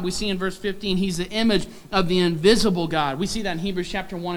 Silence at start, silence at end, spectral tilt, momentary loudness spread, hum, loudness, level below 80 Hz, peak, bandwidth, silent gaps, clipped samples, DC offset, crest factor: 0 s; 0 s; -5 dB/octave; 9 LU; none; -23 LUFS; -40 dBFS; -4 dBFS; 19.5 kHz; none; under 0.1%; under 0.1%; 18 dB